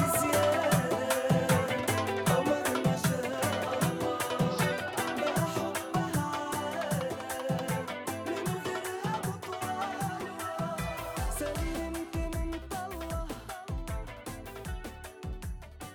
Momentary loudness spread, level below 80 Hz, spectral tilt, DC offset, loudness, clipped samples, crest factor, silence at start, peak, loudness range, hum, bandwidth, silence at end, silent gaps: 13 LU; -46 dBFS; -5 dB/octave; under 0.1%; -32 LUFS; under 0.1%; 18 dB; 0 s; -14 dBFS; 9 LU; none; 19.5 kHz; 0 s; none